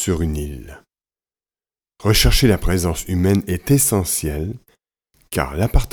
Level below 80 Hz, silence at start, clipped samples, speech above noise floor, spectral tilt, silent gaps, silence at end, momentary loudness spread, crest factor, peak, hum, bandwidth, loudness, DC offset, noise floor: -26 dBFS; 0 s; under 0.1%; over 72 dB; -4.5 dB/octave; none; 0.05 s; 13 LU; 18 dB; -2 dBFS; none; over 20 kHz; -18 LUFS; under 0.1%; under -90 dBFS